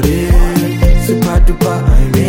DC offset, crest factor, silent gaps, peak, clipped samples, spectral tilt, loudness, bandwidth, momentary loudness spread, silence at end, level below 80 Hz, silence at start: under 0.1%; 8 dB; none; 0 dBFS; under 0.1%; -6.5 dB/octave; -12 LUFS; 17 kHz; 1 LU; 0 s; -10 dBFS; 0 s